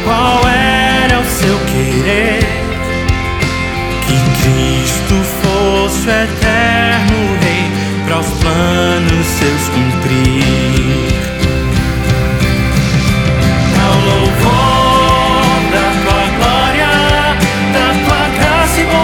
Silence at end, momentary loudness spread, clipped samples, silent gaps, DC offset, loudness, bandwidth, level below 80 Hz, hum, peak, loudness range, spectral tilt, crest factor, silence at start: 0 s; 5 LU; under 0.1%; none; under 0.1%; -11 LUFS; 20 kHz; -22 dBFS; none; 0 dBFS; 3 LU; -5 dB/octave; 10 dB; 0 s